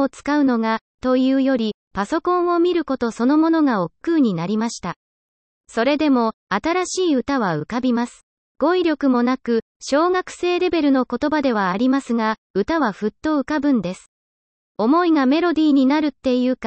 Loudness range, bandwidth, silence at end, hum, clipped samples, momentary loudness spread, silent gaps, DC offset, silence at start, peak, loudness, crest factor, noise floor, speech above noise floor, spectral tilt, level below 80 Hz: 2 LU; 8.8 kHz; 0 s; none; under 0.1%; 7 LU; 0.81-0.98 s, 1.74-1.91 s, 4.96-5.64 s, 6.34-6.47 s, 8.23-8.55 s, 9.62-9.80 s, 12.38-12.54 s, 14.08-14.75 s; under 0.1%; 0 s; -4 dBFS; -19 LUFS; 14 dB; under -90 dBFS; over 71 dB; -5.5 dB/octave; -54 dBFS